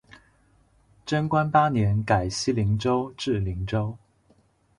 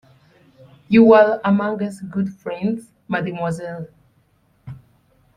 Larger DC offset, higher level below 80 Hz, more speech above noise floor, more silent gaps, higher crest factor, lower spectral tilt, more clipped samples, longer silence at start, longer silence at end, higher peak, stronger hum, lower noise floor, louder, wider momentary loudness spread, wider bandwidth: neither; first, -44 dBFS vs -58 dBFS; second, 39 dB vs 43 dB; neither; about the same, 20 dB vs 18 dB; second, -6 dB/octave vs -8 dB/octave; neither; first, 1.05 s vs 0.9 s; first, 0.8 s vs 0.6 s; second, -6 dBFS vs -2 dBFS; neither; about the same, -62 dBFS vs -60 dBFS; second, -25 LUFS vs -18 LUFS; second, 8 LU vs 25 LU; about the same, 11 kHz vs 10.5 kHz